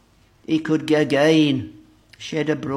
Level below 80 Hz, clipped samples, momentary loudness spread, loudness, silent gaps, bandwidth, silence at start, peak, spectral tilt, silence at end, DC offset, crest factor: -60 dBFS; under 0.1%; 13 LU; -20 LUFS; none; 12 kHz; 0.5 s; -6 dBFS; -6 dB/octave; 0 s; under 0.1%; 16 dB